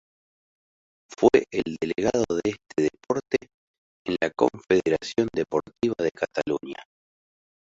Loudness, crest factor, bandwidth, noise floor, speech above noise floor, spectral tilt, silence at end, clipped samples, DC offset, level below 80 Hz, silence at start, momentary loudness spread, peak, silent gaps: -25 LUFS; 22 dB; 7.8 kHz; under -90 dBFS; over 65 dB; -5.5 dB/octave; 0.9 s; under 0.1%; under 0.1%; -58 dBFS; 1.1 s; 8 LU; -4 dBFS; 3.54-4.05 s